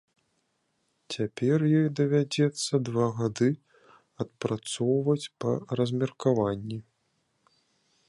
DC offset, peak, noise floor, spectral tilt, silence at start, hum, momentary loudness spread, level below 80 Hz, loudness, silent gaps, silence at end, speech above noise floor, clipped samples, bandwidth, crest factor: under 0.1%; -10 dBFS; -75 dBFS; -6.5 dB/octave; 1.1 s; none; 12 LU; -64 dBFS; -28 LUFS; none; 1.3 s; 48 dB; under 0.1%; 11.5 kHz; 18 dB